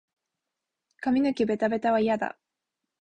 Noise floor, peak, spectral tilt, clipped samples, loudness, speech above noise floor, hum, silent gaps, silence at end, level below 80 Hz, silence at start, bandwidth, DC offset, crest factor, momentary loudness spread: -86 dBFS; -14 dBFS; -6.5 dB/octave; under 0.1%; -26 LUFS; 61 dB; none; none; 0.7 s; -66 dBFS; 1 s; 9 kHz; under 0.1%; 14 dB; 7 LU